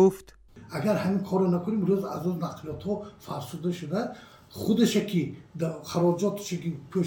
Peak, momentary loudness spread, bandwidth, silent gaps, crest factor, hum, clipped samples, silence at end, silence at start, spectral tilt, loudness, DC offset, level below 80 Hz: -10 dBFS; 13 LU; 18.5 kHz; none; 18 dB; none; under 0.1%; 0 s; 0 s; -6.5 dB/octave; -28 LUFS; under 0.1%; -62 dBFS